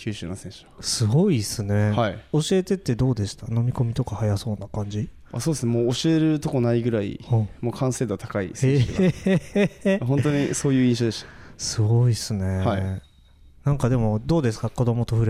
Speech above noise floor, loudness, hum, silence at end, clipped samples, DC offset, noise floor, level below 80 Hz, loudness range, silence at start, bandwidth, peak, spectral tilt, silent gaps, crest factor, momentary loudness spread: 29 dB; -23 LUFS; none; 0 s; under 0.1%; under 0.1%; -51 dBFS; -44 dBFS; 3 LU; 0 s; 14.5 kHz; -8 dBFS; -6 dB/octave; none; 14 dB; 10 LU